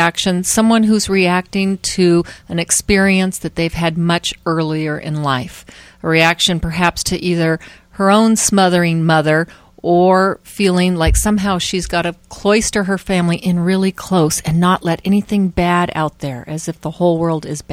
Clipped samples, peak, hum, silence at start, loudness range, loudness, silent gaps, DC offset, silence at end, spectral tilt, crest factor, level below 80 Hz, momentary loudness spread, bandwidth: under 0.1%; 0 dBFS; none; 0 s; 3 LU; -15 LUFS; none; under 0.1%; 0 s; -4.5 dB/octave; 16 dB; -32 dBFS; 9 LU; 16 kHz